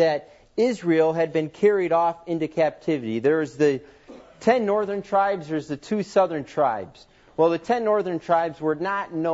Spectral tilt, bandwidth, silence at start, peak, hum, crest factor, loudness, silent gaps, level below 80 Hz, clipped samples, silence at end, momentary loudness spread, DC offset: -6.5 dB/octave; 8 kHz; 0 s; -6 dBFS; none; 16 dB; -23 LUFS; none; -62 dBFS; under 0.1%; 0 s; 8 LU; under 0.1%